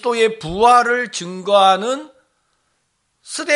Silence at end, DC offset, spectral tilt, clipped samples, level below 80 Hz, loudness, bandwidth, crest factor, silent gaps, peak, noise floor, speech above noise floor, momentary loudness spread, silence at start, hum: 0 s; under 0.1%; -3 dB/octave; under 0.1%; -50 dBFS; -16 LUFS; 11.5 kHz; 16 dB; none; 0 dBFS; -68 dBFS; 52 dB; 14 LU; 0.05 s; none